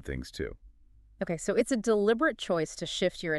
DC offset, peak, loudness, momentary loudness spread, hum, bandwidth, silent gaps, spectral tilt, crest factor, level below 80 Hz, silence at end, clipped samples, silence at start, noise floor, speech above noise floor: under 0.1%; -14 dBFS; -30 LUFS; 13 LU; none; 12.5 kHz; none; -4.5 dB/octave; 16 dB; -50 dBFS; 0 s; under 0.1%; 0.05 s; -58 dBFS; 29 dB